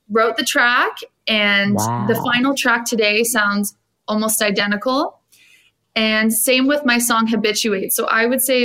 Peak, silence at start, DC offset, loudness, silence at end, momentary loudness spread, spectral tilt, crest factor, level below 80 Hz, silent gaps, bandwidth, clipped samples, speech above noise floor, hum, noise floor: -2 dBFS; 0.1 s; under 0.1%; -16 LUFS; 0 s; 7 LU; -3 dB/octave; 16 dB; -64 dBFS; none; 16 kHz; under 0.1%; 37 dB; none; -54 dBFS